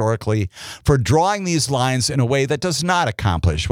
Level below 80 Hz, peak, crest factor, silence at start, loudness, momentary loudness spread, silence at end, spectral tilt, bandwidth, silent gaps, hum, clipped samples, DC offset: -38 dBFS; -4 dBFS; 16 dB; 0 s; -19 LUFS; 5 LU; 0 s; -5 dB/octave; 16 kHz; none; none; under 0.1%; under 0.1%